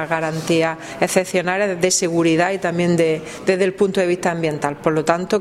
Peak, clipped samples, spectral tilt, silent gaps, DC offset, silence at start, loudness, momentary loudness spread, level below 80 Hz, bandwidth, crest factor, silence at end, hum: 0 dBFS; under 0.1%; -4.5 dB/octave; none; under 0.1%; 0 s; -19 LUFS; 5 LU; -54 dBFS; 15.5 kHz; 18 dB; 0 s; none